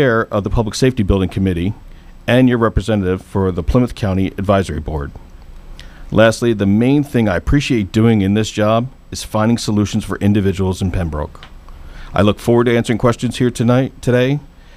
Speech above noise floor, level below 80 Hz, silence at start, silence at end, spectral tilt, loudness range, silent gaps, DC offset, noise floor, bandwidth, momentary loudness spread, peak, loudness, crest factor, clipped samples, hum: 19 dB; -30 dBFS; 0 s; 0.35 s; -6.5 dB/octave; 3 LU; none; under 0.1%; -34 dBFS; 15 kHz; 9 LU; 0 dBFS; -16 LUFS; 14 dB; under 0.1%; none